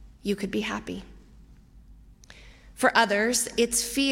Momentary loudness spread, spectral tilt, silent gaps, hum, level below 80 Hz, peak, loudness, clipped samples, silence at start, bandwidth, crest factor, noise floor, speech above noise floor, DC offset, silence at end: 12 LU; -2.5 dB/octave; none; none; -52 dBFS; -6 dBFS; -25 LUFS; under 0.1%; 0 s; 16.5 kHz; 22 dB; -52 dBFS; 26 dB; under 0.1%; 0 s